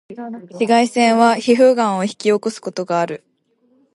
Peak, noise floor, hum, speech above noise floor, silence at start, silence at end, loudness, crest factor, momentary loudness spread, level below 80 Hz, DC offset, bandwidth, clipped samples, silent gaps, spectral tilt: -2 dBFS; -60 dBFS; none; 44 dB; 0.1 s; 0.75 s; -16 LUFS; 16 dB; 18 LU; -70 dBFS; under 0.1%; 11.5 kHz; under 0.1%; none; -4.5 dB/octave